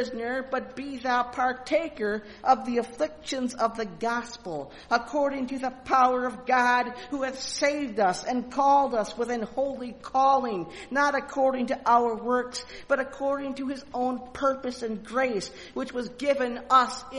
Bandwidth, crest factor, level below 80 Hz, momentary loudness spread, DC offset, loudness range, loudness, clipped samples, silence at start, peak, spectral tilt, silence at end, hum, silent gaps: 11.5 kHz; 20 dB; -58 dBFS; 11 LU; under 0.1%; 4 LU; -27 LUFS; under 0.1%; 0 s; -8 dBFS; -3.5 dB/octave; 0 s; none; none